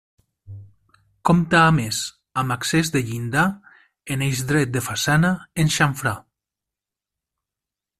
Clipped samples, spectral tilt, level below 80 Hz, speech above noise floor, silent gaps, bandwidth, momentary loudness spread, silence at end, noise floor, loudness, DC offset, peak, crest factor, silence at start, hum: under 0.1%; -4.5 dB/octave; -48 dBFS; 67 dB; none; 15 kHz; 10 LU; 1.8 s; -87 dBFS; -21 LUFS; under 0.1%; -2 dBFS; 20 dB; 0.45 s; none